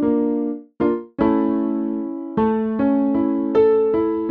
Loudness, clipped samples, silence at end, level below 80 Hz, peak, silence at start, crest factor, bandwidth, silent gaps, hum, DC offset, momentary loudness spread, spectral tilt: -20 LUFS; under 0.1%; 0 s; -50 dBFS; -6 dBFS; 0 s; 12 dB; 4.3 kHz; none; none; under 0.1%; 8 LU; -10.5 dB/octave